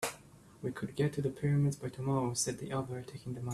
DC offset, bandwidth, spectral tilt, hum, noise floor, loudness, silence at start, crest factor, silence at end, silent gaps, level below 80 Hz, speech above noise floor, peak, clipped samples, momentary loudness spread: under 0.1%; 14 kHz; -5.5 dB/octave; none; -57 dBFS; -35 LUFS; 0 s; 16 dB; 0 s; none; -64 dBFS; 22 dB; -18 dBFS; under 0.1%; 11 LU